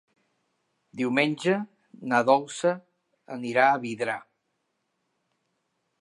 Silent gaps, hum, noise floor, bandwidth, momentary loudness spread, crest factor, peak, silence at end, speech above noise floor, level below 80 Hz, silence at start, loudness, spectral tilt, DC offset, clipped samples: none; none; -77 dBFS; 11.5 kHz; 17 LU; 22 dB; -6 dBFS; 1.8 s; 52 dB; -80 dBFS; 0.95 s; -25 LUFS; -5 dB/octave; under 0.1%; under 0.1%